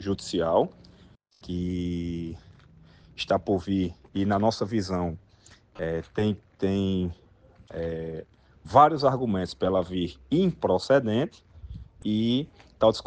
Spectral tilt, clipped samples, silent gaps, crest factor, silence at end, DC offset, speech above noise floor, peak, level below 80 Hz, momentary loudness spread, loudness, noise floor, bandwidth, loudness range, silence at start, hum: -7 dB/octave; under 0.1%; none; 22 dB; 0.05 s; under 0.1%; 31 dB; -4 dBFS; -52 dBFS; 14 LU; -27 LUFS; -56 dBFS; 9.4 kHz; 7 LU; 0 s; none